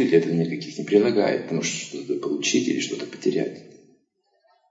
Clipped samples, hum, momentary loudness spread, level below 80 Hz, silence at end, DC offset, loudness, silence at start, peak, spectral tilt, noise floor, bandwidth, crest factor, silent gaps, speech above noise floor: under 0.1%; none; 10 LU; -76 dBFS; 1.05 s; under 0.1%; -24 LUFS; 0 s; -6 dBFS; -4.5 dB/octave; -68 dBFS; 8 kHz; 18 dB; none; 45 dB